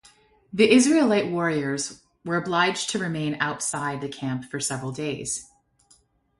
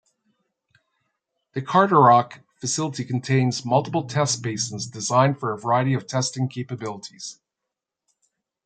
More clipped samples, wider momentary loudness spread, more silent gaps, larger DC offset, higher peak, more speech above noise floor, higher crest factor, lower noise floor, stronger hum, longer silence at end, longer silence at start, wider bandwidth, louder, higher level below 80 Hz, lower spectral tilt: neither; second, 13 LU vs 17 LU; neither; neither; about the same, -4 dBFS vs -2 dBFS; second, 38 dB vs 63 dB; about the same, 20 dB vs 20 dB; second, -61 dBFS vs -85 dBFS; neither; second, 0.95 s vs 1.35 s; second, 0.55 s vs 1.55 s; first, 11.5 kHz vs 9.4 kHz; about the same, -24 LUFS vs -22 LUFS; first, -62 dBFS vs -68 dBFS; about the same, -4 dB/octave vs -5 dB/octave